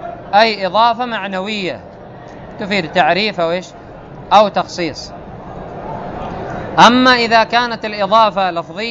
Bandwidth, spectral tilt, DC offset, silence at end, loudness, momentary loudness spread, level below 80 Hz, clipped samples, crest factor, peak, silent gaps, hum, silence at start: 11 kHz; -4.5 dB/octave; under 0.1%; 0 s; -14 LUFS; 23 LU; -44 dBFS; 0.1%; 16 dB; 0 dBFS; none; none; 0 s